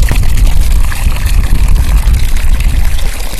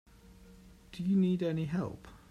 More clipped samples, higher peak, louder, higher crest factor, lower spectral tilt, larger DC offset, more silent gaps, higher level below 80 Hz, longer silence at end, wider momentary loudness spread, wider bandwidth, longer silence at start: first, 1% vs under 0.1%; first, 0 dBFS vs -20 dBFS; first, -13 LUFS vs -33 LUFS; second, 6 dB vs 14 dB; second, -4.5 dB/octave vs -8.5 dB/octave; neither; neither; first, -8 dBFS vs -60 dBFS; second, 0 s vs 0.15 s; second, 3 LU vs 19 LU; first, 14 kHz vs 9.2 kHz; second, 0 s vs 0.3 s